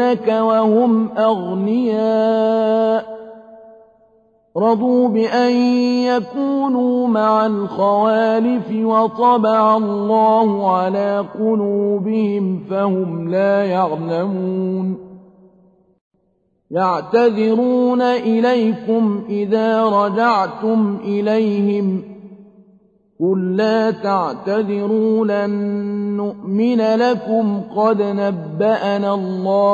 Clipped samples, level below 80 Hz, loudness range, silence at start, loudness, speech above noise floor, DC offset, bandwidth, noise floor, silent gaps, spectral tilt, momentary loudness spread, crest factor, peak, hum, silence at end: under 0.1%; -64 dBFS; 4 LU; 0 s; -17 LUFS; 47 dB; under 0.1%; 7.2 kHz; -63 dBFS; 16.01-16.11 s; -8 dB/octave; 6 LU; 14 dB; -2 dBFS; none; 0 s